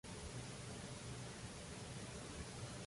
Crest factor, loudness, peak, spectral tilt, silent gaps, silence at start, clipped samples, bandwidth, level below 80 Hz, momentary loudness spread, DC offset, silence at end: 14 dB; -50 LUFS; -36 dBFS; -4 dB/octave; none; 0.05 s; under 0.1%; 11.5 kHz; -62 dBFS; 1 LU; under 0.1%; 0 s